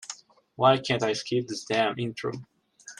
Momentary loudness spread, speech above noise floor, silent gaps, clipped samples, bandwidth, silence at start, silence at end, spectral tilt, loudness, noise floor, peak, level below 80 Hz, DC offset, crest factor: 17 LU; 20 dB; none; under 0.1%; 11.5 kHz; 0 s; 0.05 s; -4.5 dB/octave; -26 LUFS; -46 dBFS; -6 dBFS; -68 dBFS; under 0.1%; 22 dB